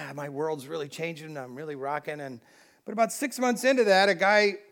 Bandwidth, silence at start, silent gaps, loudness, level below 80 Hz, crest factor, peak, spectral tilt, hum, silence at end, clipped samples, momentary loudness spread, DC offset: 19 kHz; 0 s; none; -26 LUFS; -88 dBFS; 18 dB; -8 dBFS; -3.5 dB/octave; none; 0.1 s; under 0.1%; 18 LU; under 0.1%